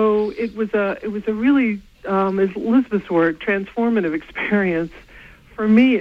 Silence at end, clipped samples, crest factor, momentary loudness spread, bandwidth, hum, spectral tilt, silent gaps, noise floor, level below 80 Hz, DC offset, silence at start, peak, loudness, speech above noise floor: 0 s; under 0.1%; 16 dB; 8 LU; 6 kHz; none; -8.5 dB/octave; none; -44 dBFS; -50 dBFS; under 0.1%; 0 s; -4 dBFS; -20 LUFS; 26 dB